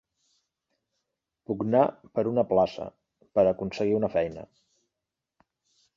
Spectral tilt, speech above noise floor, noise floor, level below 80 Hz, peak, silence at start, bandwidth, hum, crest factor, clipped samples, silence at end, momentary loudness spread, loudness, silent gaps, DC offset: -8 dB/octave; 61 dB; -87 dBFS; -60 dBFS; -8 dBFS; 1.5 s; 7.4 kHz; none; 22 dB; under 0.1%; 1.55 s; 12 LU; -26 LUFS; none; under 0.1%